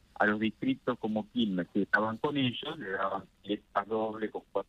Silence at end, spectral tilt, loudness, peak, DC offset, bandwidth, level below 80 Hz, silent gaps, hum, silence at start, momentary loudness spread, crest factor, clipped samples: 0.05 s; -7 dB/octave; -32 LUFS; -12 dBFS; under 0.1%; 8.2 kHz; -68 dBFS; none; none; 0.2 s; 9 LU; 20 dB; under 0.1%